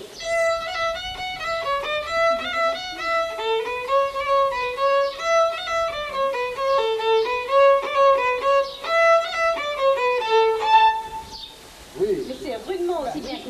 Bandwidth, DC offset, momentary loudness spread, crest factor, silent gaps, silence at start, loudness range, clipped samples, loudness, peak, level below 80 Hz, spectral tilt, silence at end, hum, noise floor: 14 kHz; under 0.1%; 11 LU; 16 dB; none; 0 s; 4 LU; under 0.1%; -21 LUFS; -6 dBFS; -52 dBFS; -2.5 dB/octave; 0 s; none; -43 dBFS